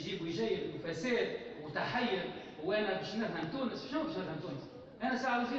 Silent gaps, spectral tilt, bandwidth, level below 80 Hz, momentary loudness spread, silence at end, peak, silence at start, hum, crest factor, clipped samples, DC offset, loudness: none; -5.5 dB/octave; 8 kHz; -68 dBFS; 9 LU; 0 s; -22 dBFS; 0 s; none; 16 dB; under 0.1%; under 0.1%; -37 LUFS